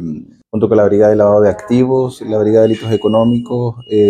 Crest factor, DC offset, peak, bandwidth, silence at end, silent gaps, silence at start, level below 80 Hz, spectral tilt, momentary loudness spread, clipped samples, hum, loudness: 12 dB; under 0.1%; 0 dBFS; 9.8 kHz; 0 s; none; 0 s; -48 dBFS; -8 dB/octave; 9 LU; under 0.1%; none; -12 LUFS